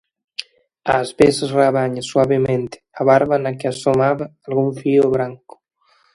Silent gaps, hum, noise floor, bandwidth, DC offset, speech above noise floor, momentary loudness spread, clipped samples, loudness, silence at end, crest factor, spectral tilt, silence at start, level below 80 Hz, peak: none; none; -60 dBFS; 11.5 kHz; under 0.1%; 43 dB; 13 LU; under 0.1%; -18 LUFS; 0.8 s; 18 dB; -6 dB/octave; 0.4 s; -52 dBFS; 0 dBFS